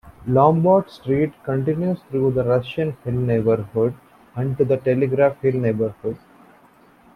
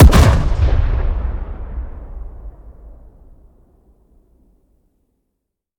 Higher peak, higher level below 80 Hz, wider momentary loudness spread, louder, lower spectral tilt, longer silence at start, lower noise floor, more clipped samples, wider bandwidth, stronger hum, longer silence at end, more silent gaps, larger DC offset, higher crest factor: about the same, -2 dBFS vs 0 dBFS; second, -52 dBFS vs -18 dBFS; second, 9 LU vs 23 LU; second, -20 LUFS vs -17 LUFS; first, -10 dB/octave vs -6.5 dB/octave; about the same, 0.05 s vs 0 s; second, -52 dBFS vs -76 dBFS; neither; second, 5.4 kHz vs 16 kHz; neither; second, 1 s vs 2.85 s; neither; neither; about the same, 18 dB vs 16 dB